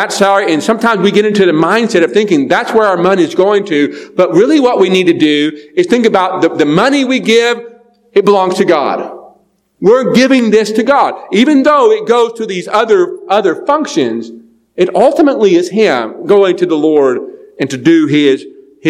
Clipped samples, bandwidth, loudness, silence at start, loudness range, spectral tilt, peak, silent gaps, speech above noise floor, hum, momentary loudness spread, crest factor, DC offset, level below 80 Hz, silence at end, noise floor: 0.9%; 13.5 kHz; -10 LUFS; 0 s; 2 LU; -5 dB/octave; 0 dBFS; none; 41 dB; none; 7 LU; 10 dB; under 0.1%; -58 dBFS; 0 s; -51 dBFS